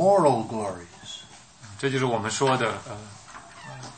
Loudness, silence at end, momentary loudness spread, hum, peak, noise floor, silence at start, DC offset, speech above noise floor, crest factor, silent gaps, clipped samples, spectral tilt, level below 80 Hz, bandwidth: -25 LUFS; 0 s; 22 LU; none; -6 dBFS; -47 dBFS; 0 s; under 0.1%; 23 dB; 20 dB; none; under 0.1%; -5 dB/octave; -62 dBFS; 8.8 kHz